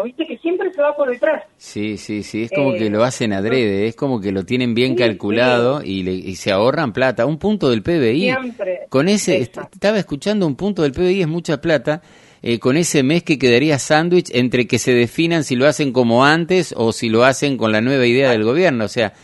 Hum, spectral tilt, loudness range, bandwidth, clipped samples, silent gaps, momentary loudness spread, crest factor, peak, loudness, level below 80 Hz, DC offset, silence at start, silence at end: none; -5 dB/octave; 4 LU; 11.5 kHz; under 0.1%; none; 9 LU; 16 dB; 0 dBFS; -17 LUFS; -50 dBFS; under 0.1%; 0 s; 0.15 s